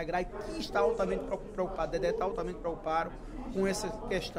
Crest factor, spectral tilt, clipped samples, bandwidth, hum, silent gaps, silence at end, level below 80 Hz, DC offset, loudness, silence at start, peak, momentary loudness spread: 16 dB; -5 dB/octave; under 0.1%; 16 kHz; none; none; 0 s; -46 dBFS; under 0.1%; -33 LUFS; 0 s; -16 dBFS; 9 LU